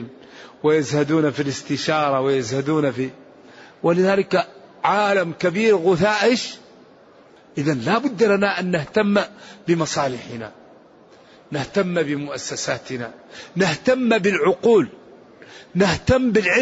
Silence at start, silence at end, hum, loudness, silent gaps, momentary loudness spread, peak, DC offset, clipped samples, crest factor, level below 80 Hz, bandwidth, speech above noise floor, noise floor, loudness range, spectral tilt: 0 s; 0 s; none; -20 LUFS; none; 14 LU; -4 dBFS; under 0.1%; under 0.1%; 16 dB; -50 dBFS; 8 kHz; 29 dB; -49 dBFS; 6 LU; -4.5 dB/octave